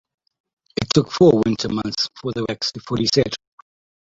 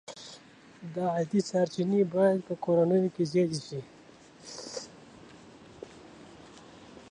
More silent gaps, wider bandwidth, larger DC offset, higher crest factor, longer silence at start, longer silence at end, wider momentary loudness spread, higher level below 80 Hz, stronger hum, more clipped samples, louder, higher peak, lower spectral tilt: neither; second, 8 kHz vs 10.5 kHz; neither; about the same, 20 dB vs 16 dB; first, 0.8 s vs 0.1 s; first, 0.75 s vs 0.1 s; second, 12 LU vs 25 LU; first, -50 dBFS vs -70 dBFS; neither; neither; first, -20 LUFS vs -28 LUFS; first, -2 dBFS vs -14 dBFS; about the same, -5.5 dB/octave vs -6.5 dB/octave